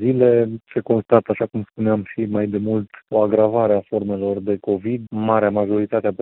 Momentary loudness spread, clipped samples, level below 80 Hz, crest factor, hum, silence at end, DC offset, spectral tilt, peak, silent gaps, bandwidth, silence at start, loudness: 7 LU; under 0.1%; -60 dBFS; 18 dB; none; 0.05 s; under 0.1%; -12.5 dB/octave; 0 dBFS; none; 4.1 kHz; 0 s; -20 LUFS